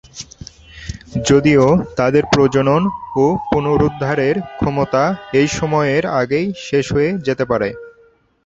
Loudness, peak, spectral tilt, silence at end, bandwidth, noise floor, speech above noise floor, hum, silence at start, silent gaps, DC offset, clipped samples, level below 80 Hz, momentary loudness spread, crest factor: -16 LUFS; 0 dBFS; -6 dB/octave; 0.55 s; 8 kHz; -52 dBFS; 37 dB; none; 0.15 s; none; under 0.1%; under 0.1%; -40 dBFS; 15 LU; 16 dB